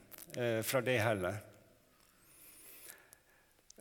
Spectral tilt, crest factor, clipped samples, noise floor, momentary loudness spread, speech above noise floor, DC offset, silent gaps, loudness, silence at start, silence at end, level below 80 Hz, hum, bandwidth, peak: -4.5 dB/octave; 22 dB; under 0.1%; -69 dBFS; 23 LU; 34 dB; under 0.1%; none; -36 LUFS; 0.1 s; 0.85 s; -74 dBFS; none; 19 kHz; -18 dBFS